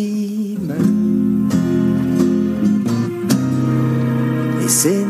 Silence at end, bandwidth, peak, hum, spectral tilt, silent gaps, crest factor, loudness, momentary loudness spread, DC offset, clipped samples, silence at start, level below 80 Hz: 0 s; 15.5 kHz; -2 dBFS; none; -6 dB/octave; none; 14 dB; -17 LUFS; 5 LU; under 0.1%; under 0.1%; 0 s; -50 dBFS